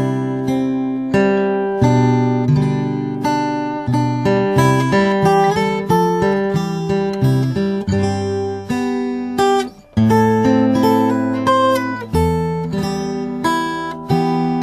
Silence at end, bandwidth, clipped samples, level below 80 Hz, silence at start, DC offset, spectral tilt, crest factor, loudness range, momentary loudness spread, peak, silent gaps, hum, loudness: 0 s; 14 kHz; under 0.1%; -40 dBFS; 0 s; under 0.1%; -7 dB/octave; 16 dB; 3 LU; 7 LU; 0 dBFS; none; none; -17 LUFS